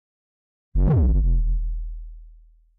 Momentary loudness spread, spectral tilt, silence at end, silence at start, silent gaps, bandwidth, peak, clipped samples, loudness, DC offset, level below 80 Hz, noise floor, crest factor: 17 LU; -13.5 dB/octave; 0.5 s; 0.75 s; none; 1.9 kHz; -14 dBFS; under 0.1%; -23 LUFS; under 0.1%; -24 dBFS; -50 dBFS; 8 dB